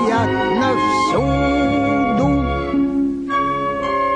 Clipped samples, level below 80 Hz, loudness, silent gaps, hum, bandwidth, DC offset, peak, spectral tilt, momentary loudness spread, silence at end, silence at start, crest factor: under 0.1%; -32 dBFS; -18 LUFS; none; none; 10 kHz; under 0.1%; -6 dBFS; -6.5 dB/octave; 3 LU; 0 s; 0 s; 10 dB